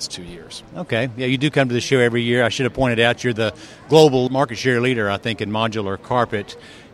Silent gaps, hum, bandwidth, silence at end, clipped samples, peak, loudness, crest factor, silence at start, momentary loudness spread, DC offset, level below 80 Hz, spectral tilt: none; none; 13.5 kHz; 0.1 s; under 0.1%; 0 dBFS; -19 LUFS; 20 dB; 0 s; 17 LU; under 0.1%; -50 dBFS; -5.5 dB/octave